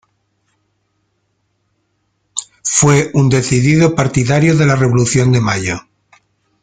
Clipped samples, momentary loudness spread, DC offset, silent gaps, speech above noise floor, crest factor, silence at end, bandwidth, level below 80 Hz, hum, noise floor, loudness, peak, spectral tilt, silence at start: under 0.1%; 12 LU; under 0.1%; none; 54 dB; 14 dB; 0.85 s; 9.6 kHz; -42 dBFS; none; -65 dBFS; -12 LUFS; 0 dBFS; -5 dB/octave; 2.35 s